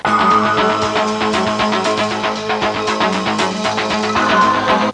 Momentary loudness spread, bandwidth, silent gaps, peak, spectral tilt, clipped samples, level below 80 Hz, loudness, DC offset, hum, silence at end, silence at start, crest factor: 5 LU; 11 kHz; none; -2 dBFS; -4 dB/octave; under 0.1%; -46 dBFS; -15 LUFS; under 0.1%; none; 0 s; 0.05 s; 12 dB